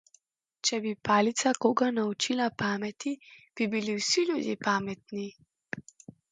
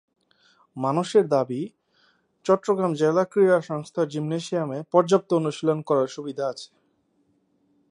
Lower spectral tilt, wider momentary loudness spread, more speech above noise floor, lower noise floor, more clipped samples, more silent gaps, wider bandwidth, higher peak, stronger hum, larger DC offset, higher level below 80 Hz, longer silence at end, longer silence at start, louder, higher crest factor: second, -3.5 dB/octave vs -6.5 dB/octave; first, 15 LU vs 11 LU; second, 38 dB vs 45 dB; about the same, -67 dBFS vs -68 dBFS; neither; neither; second, 9.6 kHz vs 11 kHz; second, -10 dBFS vs -4 dBFS; neither; neither; first, -70 dBFS vs -76 dBFS; second, 0.5 s vs 1.25 s; about the same, 0.65 s vs 0.75 s; second, -29 LUFS vs -24 LUFS; about the same, 20 dB vs 20 dB